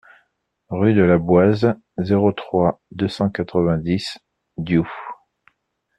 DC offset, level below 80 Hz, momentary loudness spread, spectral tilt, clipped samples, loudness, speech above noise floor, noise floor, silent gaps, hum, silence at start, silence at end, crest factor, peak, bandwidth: under 0.1%; -50 dBFS; 16 LU; -8 dB/octave; under 0.1%; -19 LUFS; 53 dB; -71 dBFS; none; none; 0.7 s; 0.85 s; 16 dB; -4 dBFS; 9.6 kHz